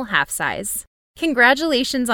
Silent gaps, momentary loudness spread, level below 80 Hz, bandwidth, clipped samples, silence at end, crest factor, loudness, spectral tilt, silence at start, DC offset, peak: 0.87-1.14 s; 11 LU; -50 dBFS; 19 kHz; under 0.1%; 0 s; 18 dB; -18 LUFS; -2 dB/octave; 0 s; under 0.1%; -2 dBFS